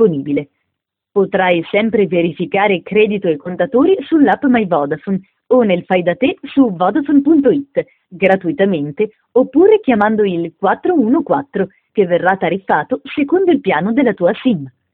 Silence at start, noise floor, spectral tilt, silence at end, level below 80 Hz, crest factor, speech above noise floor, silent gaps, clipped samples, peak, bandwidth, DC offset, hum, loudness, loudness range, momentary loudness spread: 0 s; -76 dBFS; -9.5 dB/octave; 0.25 s; -56 dBFS; 14 dB; 63 dB; none; under 0.1%; 0 dBFS; 4.1 kHz; under 0.1%; none; -14 LUFS; 2 LU; 8 LU